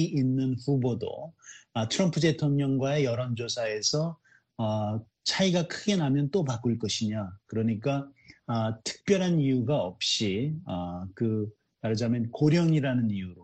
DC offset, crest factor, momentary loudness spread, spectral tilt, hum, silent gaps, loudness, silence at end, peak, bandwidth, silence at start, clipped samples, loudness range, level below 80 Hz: under 0.1%; 16 dB; 10 LU; -5.5 dB/octave; none; none; -28 LUFS; 0 s; -12 dBFS; 8.8 kHz; 0 s; under 0.1%; 1 LU; -64 dBFS